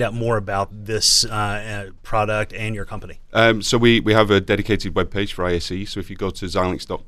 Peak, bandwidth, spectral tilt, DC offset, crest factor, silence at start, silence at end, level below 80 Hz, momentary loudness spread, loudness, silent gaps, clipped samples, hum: 0 dBFS; 14 kHz; -4 dB/octave; under 0.1%; 20 dB; 0 s; 0 s; -36 dBFS; 13 LU; -19 LUFS; none; under 0.1%; none